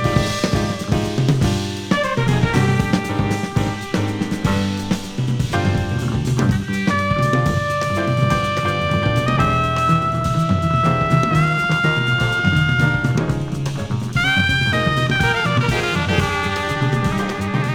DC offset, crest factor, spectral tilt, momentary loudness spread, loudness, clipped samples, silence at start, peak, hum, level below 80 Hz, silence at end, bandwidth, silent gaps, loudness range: under 0.1%; 16 dB; -6 dB/octave; 5 LU; -18 LUFS; under 0.1%; 0 s; -2 dBFS; none; -36 dBFS; 0 s; 16 kHz; none; 3 LU